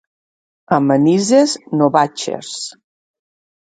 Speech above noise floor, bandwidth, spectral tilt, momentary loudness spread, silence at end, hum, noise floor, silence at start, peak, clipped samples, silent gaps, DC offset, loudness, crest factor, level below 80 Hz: over 75 dB; 9.4 kHz; -5 dB/octave; 13 LU; 1.1 s; none; under -90 dBFS; 0.7 s; 0 dBFS; under 0.1%; none; under 0.1%; -15 LUFS; 18 dB; -64 dBFS